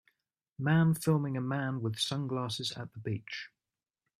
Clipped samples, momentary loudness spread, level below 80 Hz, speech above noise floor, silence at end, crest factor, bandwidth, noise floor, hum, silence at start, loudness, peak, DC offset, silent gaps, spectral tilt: under 0.1%; 13 LU; -70 dBFS; over 58 dB; 0.7 s; 18 dB; 14.5 kHz; under -90 dBFS; none; 0.6 s; -33 LUFS; -14 dBFS; under 0.1%; none; -5.5 dB/octave